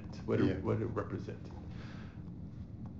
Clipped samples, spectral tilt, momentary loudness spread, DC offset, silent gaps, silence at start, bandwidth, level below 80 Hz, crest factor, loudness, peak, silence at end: under 0.1%; -8 dB/octave; 15 LU; 0.1%; none; 0 s; 7.4 kHz; -54 dBFS; 18 dB; -38 LUFS; -20 dBFS; 0 s